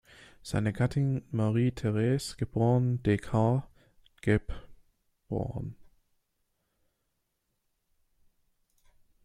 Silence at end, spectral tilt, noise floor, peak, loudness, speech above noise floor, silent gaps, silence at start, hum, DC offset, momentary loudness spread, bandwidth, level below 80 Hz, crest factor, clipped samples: 3.5 s; -7.5 dB/octave; -79 dBFS; -10 dBFS; -30 LUFS; 51 dB; none; 0.45 s; none; under 0.1%; 11 LU; 12 kHz; -52 dBFS; 20 dB; under 0.1%